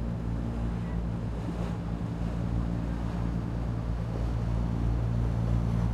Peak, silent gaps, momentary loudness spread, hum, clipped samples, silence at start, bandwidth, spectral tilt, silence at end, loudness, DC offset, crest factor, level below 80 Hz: -16 dBFS; none; 5 LU; none; under 0.1%; 0 s; 8.6 kHz; -8.5 dB/octave; 0 s; -32 LUFS; under 0.1%; 12 dB; -34 dBFS